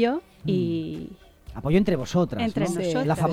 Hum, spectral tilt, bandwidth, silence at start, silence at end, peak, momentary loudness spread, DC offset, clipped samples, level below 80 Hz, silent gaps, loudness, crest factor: none; -7 dB/octave; 14 kHz; 0 s; 0 s; -8 dBFS; 13 LU; under 0.1%; under 0.1%; -46 dBFS; none; -25 LUFS; 16 dB